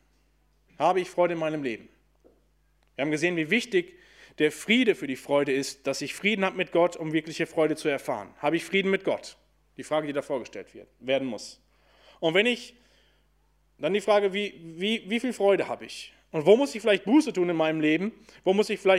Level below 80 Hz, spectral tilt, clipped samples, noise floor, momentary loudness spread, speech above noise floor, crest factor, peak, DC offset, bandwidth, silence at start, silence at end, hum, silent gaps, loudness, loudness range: -68 dBFS; -4.5 dB/octave; under 0.1%; -66 dBFS; 12 LU; 40 dB; 22 dB; -6 dBFS; under 0.1%; 15 kHz; 0.8 s; 0 s; none; none; -26 LUFS; 5 LU